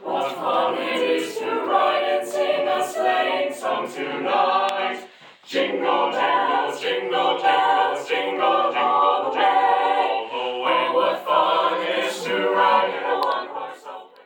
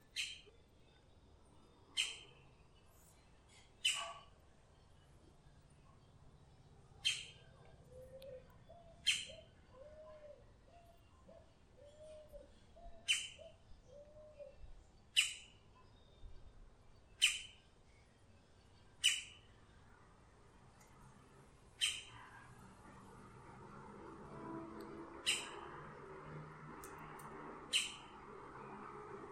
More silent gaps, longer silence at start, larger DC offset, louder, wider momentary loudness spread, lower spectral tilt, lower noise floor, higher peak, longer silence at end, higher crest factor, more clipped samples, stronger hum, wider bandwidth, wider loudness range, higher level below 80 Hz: neither; about the same, 0 s vs 0 s; neither; first, -21 LUFS vs -41 LUFS; second, 7 LU vs 27 LU; first, -3 dB/octave vs -0.5 dB/octave; second, -44 dBFS vs -67 dBFS; first, -4 dBFS vs -18 dBFS; first, 0.2 s vs 0 s; second, 16 dB vs 30 dB; neither; neither; first, 18 kHz vs 14 kHz; second, 3 LU vs 7 LU; second, under -90 dBFS vs -68 dBFS